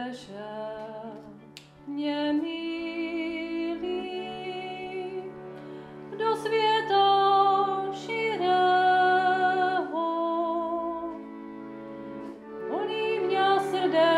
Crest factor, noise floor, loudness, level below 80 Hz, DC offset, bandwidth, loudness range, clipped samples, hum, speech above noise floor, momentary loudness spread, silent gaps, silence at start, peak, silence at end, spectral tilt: 16 dB; -49 dBFS; -26 LUFS; -68 dBFS; under 0.1%; 12 kHz; 10 LU; under 0.1%; none; 19 dB; 19 LU; none; 0 s; -12 dBFS; 0 s; -5 dB/octave